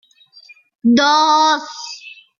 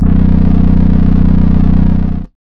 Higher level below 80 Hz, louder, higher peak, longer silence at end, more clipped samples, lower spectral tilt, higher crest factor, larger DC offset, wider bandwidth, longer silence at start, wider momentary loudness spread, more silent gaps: second, -64 dBFS vs -12 dBFS; second, -14 LUFS vs -11 LUFS; second, -4 dBFS vs 0 dBFS; about the same, 0.25 s vs 0.15 s; second, under 0.1% vs 2%; second, -2.5 dB/octave vs -11.5 dB/octave; first, 14 dB vs 8 dB; neither; first, 7.4 kHz vs 3.9 kHz; first, 0.85 s vs 0 s; first, 18 LU vs 3 LU; neither